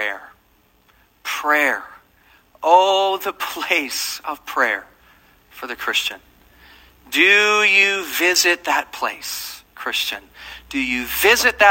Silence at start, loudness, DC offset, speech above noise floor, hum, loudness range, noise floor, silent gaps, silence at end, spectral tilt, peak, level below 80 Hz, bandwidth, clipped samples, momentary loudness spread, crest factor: 0 s; -17 LUFS; under 0.1%; 39 dB; none; 7 LU; -58 dBFS; none; 0 s; -0.5 dB/octave; 0 dBFS; -54 dBFS; 16.5 kHz; under 0.1%; 16 LU; 20 dB